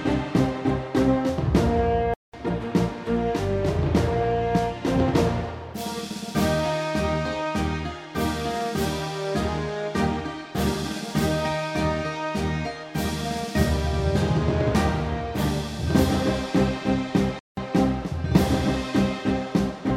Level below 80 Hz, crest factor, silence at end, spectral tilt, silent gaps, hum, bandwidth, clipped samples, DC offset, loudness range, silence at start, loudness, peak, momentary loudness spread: -36 dBFS; 20 dB; 0 s; -6.5 dB/octave; 2.16-2.32 s, 17.40-17.55 s; none; 16.5 kHz; under 0.1%; under 0.1%; 3 LU; 0 s; -25 LUFS; -4 dBFS; 7 LU